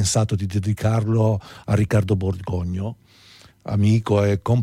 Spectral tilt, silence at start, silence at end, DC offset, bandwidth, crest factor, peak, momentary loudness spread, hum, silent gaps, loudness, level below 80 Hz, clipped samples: -6.5 dB/octave; 0 s; 0 s; under 0.1%; 12.5 kHz; 12 dB; -8 dBFS; 8 LU; none; none; -21 LUFS; -46 dBFS; under 0.1%